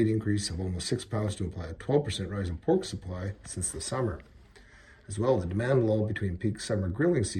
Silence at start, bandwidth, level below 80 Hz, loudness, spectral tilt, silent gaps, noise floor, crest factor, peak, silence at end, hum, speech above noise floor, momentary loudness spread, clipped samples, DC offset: 0 s; 13 kHz; -50 dBFS; -30 LUFS; -5.5 dB/octave; none; -54 dBFS; 18 dB; -12 dBFS; 0 s; none; 25 dB; 10 LU; under 0.1%; under 0.1%